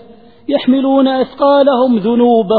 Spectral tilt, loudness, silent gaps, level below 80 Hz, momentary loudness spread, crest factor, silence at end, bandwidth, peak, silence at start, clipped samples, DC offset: -9.5 dB/octave; -12 LUFS; none; -54 dBFS; 6 LU; 12 dB; 0 s; 4.7 kHz; 0 dBFS; 0.5 s; under 0.1%; 0.4%